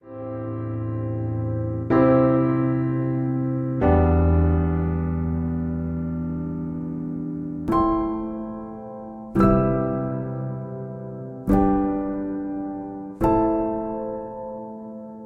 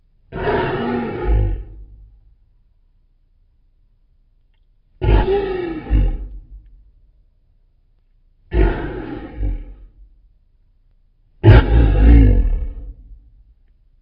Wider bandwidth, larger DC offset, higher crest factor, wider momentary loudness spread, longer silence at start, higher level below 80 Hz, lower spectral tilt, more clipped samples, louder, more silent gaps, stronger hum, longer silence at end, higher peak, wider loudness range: about the same, 4.5 kHz vs 4.9 kHz; neither; about the same, 18 dB vs 18 dB; second, 15 LU vs 22 LU; second, 0.05 s vs 0.3 s; second, -38 dBFS vs -20 dBFS; first, -11 dB/octave vs -7.5 dB/octave; neither; second, -24 LUFS vs -17 LUFS; neither; neither; second, 0 s vs 0.85 s; second, -6 dBFS vs 0 dBFS; second, 6 LU vs 11 LU